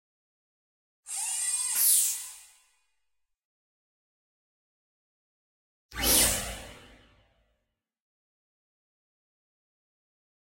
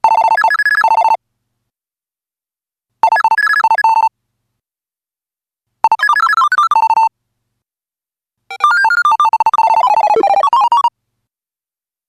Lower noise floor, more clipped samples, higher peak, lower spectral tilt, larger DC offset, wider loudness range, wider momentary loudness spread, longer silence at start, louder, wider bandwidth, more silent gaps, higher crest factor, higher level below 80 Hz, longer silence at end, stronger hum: second, -82 dBFS vs under -90 dBFS; neither; second, -8 dBFS vs 0 dBFS; about the same, -0.5 dB/octave vs -1 dB/octave; neither; about the same, 5 LU vs 3 LU; first, 20 LU vs 5 LU; first, 1.05 s vs 0.05 s; second, -24 LUFS vs -11 LUFS; first, 16.5 kHz vs 13.5 kHz; first, 3.45-5.89 s vs none; first, 26 dB vs 14 dB; first, -52 dBFS vs -64 dBFS; first, 3.7 s vs 1.2 s; neither